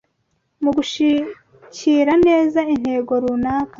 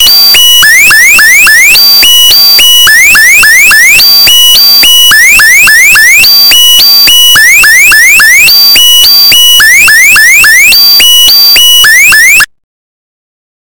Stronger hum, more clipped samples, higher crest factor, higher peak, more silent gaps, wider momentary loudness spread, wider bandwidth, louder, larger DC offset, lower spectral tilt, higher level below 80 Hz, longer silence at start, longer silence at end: neither; second, under 0.1% vs 30%; first, 14 dB vs 2 dB; second, -4 dBFS vs 0 dBFS; neither; first, 9 LU vs 0 LU; second, 7.6 kHz vs over 20 kHz; second, -18 LUFS vs 2 LUFS; neither; first, -5 dB/octave vs 2.5 dB/octave; second, -50 dBFS vs -34 dBFS; first, 0.6 s vs 0 s; second, 0.1 s vs 1.1 s